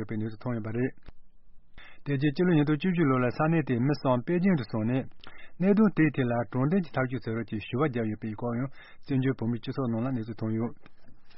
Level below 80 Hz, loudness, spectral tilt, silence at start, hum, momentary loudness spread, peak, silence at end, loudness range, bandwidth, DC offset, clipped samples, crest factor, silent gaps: -56 dBFS; -28 LUFS; -7.5 dB/octave; 0 s; none; 9 LU; -12 dBFS; 0 s; 5 LU; 5.8 kHz; under 0.1%; under 0.1%; 16 dB; none